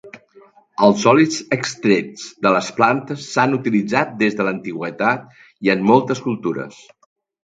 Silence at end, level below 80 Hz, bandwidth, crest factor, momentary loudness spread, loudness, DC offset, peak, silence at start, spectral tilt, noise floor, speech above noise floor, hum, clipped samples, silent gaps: 0.75 s; -62 dBFS; 9.2 kHz; 18 dB; 11 LU; -18 LUFS; under 0.1%; 0 dBFS; 0.05 s; -5.5 dB/octave; -50 dBFS; 32 dB; none; under 0.1%; none